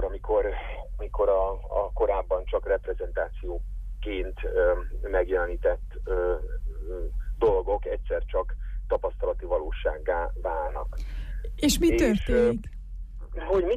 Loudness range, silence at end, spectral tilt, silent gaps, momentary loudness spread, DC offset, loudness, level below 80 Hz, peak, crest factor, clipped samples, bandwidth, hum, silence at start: 3 LU; 0 s; -5.5 dB/octave; none; 14 LU; under 0.1%; -28 LUFS; -32 dBFS; -12 dBFS; 14 dB; under 0.1%; 15 kHz; none; 0 s